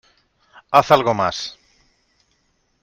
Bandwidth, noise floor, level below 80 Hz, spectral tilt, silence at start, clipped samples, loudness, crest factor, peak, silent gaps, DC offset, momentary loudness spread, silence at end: 16 kHz; -66 dBFS; -58 dBFS; -4.5 dB/octave; 0.7 s; under 0.1%; -17 LUFS; 22 dB; 0 dBFS; none; under 0.1%; 15 LU; 1.3 s